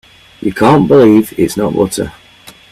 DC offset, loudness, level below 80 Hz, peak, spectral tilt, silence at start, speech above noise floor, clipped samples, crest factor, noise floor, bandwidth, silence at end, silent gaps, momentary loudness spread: under 0.1%; -11 LUFS; -42 dBFS; 0 dBFS; -6.5 dB/octave; 0.4 s; 30 dB; under 0.1%; 12 dB; -39 dBFS; 14.5 kHz; 0.2 s; none; 14 LU